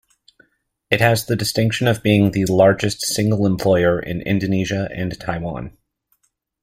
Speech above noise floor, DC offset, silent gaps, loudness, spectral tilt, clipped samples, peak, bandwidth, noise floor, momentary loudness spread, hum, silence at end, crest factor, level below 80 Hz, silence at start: 48 dB; under 0.1%; none; -18 LUFS; -5.5 dB/octave; under 0.1%; 0 dBFS; 16 kHz; -66 dBFS; 11 LU; none; 0.95 s; 20 dB; -46 dBFS; 0.9 s